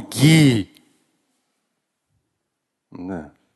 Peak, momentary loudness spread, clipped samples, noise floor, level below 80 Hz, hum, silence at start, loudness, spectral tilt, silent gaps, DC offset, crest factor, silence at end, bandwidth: -2 dBFS; 23 LU; under 0.1%; -78 dBFS; -54 dBFS; none; 0 s; -15 LUFS; -5.5 dB/octave; none; under 0.1%; 20 dB; 0.35 s; 12.5 kHz